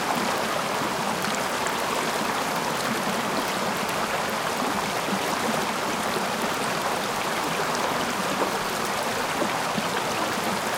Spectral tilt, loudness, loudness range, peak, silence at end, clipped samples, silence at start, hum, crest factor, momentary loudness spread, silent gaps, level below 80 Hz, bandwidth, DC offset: -3 dB/octave; -25 LUFS; 0 LU; -10 dBFS; 0 s; under 0.1%; 0 s; none; 16 dB; 1 LU; none; -58 dBFS; 18 kHz; under 0.1%